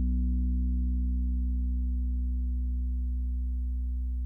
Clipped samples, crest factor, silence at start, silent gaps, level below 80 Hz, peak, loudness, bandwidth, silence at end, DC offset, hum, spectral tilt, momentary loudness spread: under 0.1%; 8 dB; 0 s; none; -28 dBFS; -20 dBFS; -32 LUFS; 0.4 kHz; 0 s; under 0.1%; 60 Hz at -80 dBFS; -12 dB/octave; 4 LU